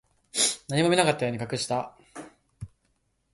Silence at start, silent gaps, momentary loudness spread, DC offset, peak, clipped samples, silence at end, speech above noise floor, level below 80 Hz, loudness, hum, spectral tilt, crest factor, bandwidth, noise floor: 0.35 s; none; 24 LU; under 0.1%; -6 dBFS; under 0.1%; 0.65 s; 47 dB; -60 dBFS; -25 LUFS; none; -3.5 dB/octave; 24 dB; 12 kHz; -72 dBFS